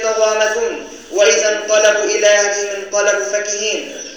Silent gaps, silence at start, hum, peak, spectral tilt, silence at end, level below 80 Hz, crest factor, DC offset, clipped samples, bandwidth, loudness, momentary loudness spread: none; 0 s; none; 0 dBFS; 0.5 dB/octave; 0 s; -60 dBFS; 14 dB; 0.3%; under 0.1%; over 20 kHz; -15 LUFS; 9 LU